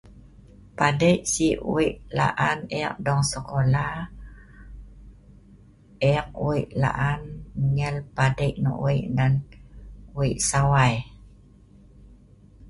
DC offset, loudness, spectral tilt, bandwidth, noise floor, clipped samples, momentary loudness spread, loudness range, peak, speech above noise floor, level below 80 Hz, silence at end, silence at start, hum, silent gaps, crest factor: under 0.1%; -24 LUFS; -5.5 dB/octave; 11.5 kHz; -51 dBFS; under 0.1%; 11 LU; 5 LU; -4 dBFS; 28 dB; -44 dBFS; 0 s; 0.1 s; none; none; 20 dB